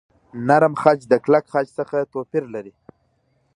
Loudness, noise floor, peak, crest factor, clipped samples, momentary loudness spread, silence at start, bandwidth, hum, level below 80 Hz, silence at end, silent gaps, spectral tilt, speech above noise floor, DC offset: -19 LUFS; -65 dBFS; 0 dBFS; 20 dB; under 0.1%; 14 LU; 0.35 s; 11 kHz; none; -66 dBFS; 0.85 s; none; -7.5 dB/octave; 46 dB; under 0.1%